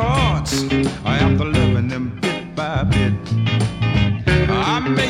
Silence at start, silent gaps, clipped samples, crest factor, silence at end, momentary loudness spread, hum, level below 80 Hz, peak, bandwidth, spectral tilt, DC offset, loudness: 0 s; none; under 0.1%; 16 dB; 0 s; 6 LU; none; -30 dBFS; -2 dBFS; 14 kHz; -6 dB/octave; under 0.1%; -18 LUFS